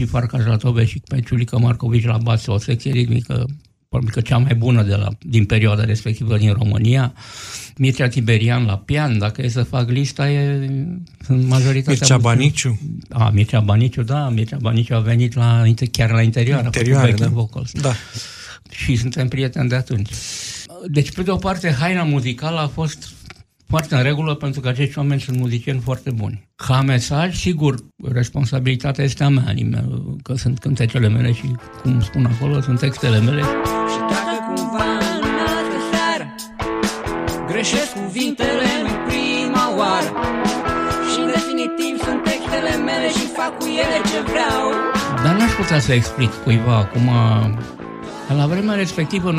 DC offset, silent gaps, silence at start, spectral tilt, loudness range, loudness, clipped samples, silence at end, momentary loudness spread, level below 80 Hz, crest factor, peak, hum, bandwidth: under 0.1%; none; 0 s; -6 dB/octave; 4 LU; -18 LUFS; under 0.1%; 0 s; 8 LU; -40 dBFS; 18 dB; 0 dBFS; none; 14.5 kHz